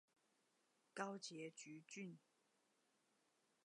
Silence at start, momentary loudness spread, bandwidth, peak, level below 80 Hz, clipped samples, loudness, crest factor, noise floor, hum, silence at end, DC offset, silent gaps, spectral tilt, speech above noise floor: 0.95 s; 9 LU; 11 kHz; -32 dBFS; under -90 dBFS; under 0.1%; -54 LUFS; 26 dB; -84 dBFS; none; 1.5 s; under 0.1%; none; -3.5 dB/octave; 30 dB